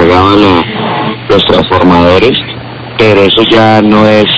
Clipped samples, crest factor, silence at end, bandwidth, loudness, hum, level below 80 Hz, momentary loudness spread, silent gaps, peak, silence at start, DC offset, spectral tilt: 7%; 6 dB; 0 s; 8 kHz; -6 LUFS; none; -28 dBFS; 9 LU; none; 0 dBFS; 0 s; under 0.1%; -6.5 dB/octave